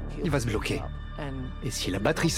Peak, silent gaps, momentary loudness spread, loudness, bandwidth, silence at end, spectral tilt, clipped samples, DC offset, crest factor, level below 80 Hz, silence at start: -8 dBFS; none; 10 LU; -30 LUFS; 16.5 kHz; 0 s; -5 dB/octave; under 0.1%; under 0.1%; 22 dB; -38 dBFS; 0 s